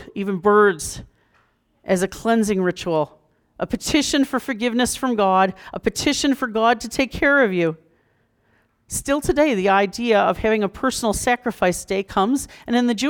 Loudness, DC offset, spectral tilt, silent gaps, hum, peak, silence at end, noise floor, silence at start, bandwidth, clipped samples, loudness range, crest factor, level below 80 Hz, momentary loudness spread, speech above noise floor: -20 LUFS; under 0.1%; -4 dB/octave; none; none; -6 dBFS; 0 s; -63 dBFS; 0 s; 19.5 kHz; under 0.1%; 2 LU; 16 dB; -44 dBFS; 9 LU; 44 dB